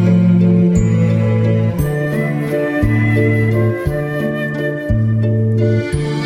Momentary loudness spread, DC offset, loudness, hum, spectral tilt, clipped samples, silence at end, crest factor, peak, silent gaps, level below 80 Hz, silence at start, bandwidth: 7 LU; under 0.1%; -15 LUFS; none; -8.5 dB/octave; under 0.1%; 0 s; 14 dB; 0 dBFS; none; -32 dBFS; 0 s; 13 kHz